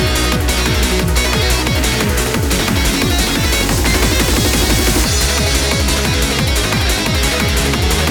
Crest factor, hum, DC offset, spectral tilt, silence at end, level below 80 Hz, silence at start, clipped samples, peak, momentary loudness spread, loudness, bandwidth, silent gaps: 14 dB; none; under 0.1%; -3.5 dB/octave; 0 s; -18 dBFS; 0 s; under 0.1%; 0 dBFS; 2 LU; -14 LUFS; over 20 kHz; none